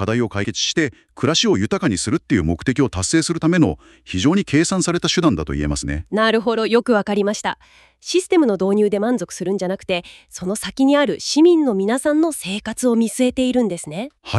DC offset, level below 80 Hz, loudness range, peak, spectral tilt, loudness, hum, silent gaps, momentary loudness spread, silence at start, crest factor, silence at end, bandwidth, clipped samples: under 0.1%; -40 dBFS; 2 LU; -2 dBFS; -4.5 dB/octave; -18 LUFS; none; none; 9 LU; 0 s; 16 dB; 0 s; 13 kHz; under 0.1%